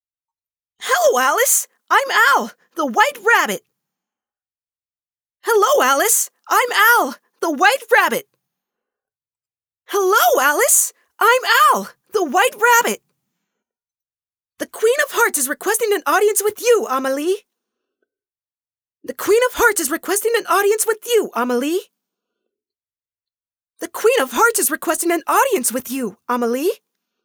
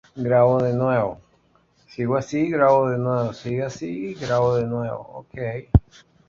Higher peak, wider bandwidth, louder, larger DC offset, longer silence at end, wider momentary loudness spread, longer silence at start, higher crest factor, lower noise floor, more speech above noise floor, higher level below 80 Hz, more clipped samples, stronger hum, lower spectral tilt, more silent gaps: about the same, 0 dBFS vs -2 dBFS; first, over 20 kHz vs 7.4 kHz; first, -16 LUFS vs -22 LUFS; neither; about the same, 0.5 s vs 0.5 s; about the same, 12 LU vs 13 LU; first, 0.8 s vs 0.15 s; about the same, 18 dB vs 20 dB; first, under -90 dBFS vs -61 dBFS; first, over 73 dB vs 39 dB; second, -60 dBFS vs -36 dBFS; neither; neither; second, -0.5 dB/octave vs -8 dB/octave; neither